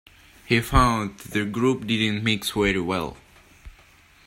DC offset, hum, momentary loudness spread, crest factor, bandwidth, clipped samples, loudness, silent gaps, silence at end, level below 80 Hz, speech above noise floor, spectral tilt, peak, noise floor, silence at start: under 0.1%; none; 8 LU; 22 dB; 16 kHz; under 0.1%; -23 LUFS; none; 0.55 s; -36 dBFS; 31 dB; -5 dB/octave; -4 dBFS; -54 dBFS; 0.5 s